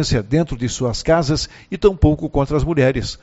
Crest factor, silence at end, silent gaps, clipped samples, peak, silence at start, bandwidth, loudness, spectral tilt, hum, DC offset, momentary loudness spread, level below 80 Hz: 18 dB; 0.05 s; none; under 0.1%; 0 dBFS; 0 s; 8 kHz; -18 LUFS; -6 dB/octave; none; under 0.1%; 6 LU; -28 dBFS